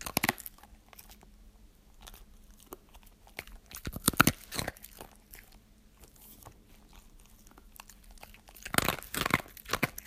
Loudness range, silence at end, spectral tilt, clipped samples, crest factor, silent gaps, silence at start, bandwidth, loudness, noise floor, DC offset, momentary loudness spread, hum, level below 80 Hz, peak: 20 LU; 0.05 s; -3 dB/octave; under 0.1%; 36 dB; none; 0 s; 16 kHz; -31 LUFS; -58 dBFS; under 0.1%; 25 LU; none; -52 dBFS; 0 dBFS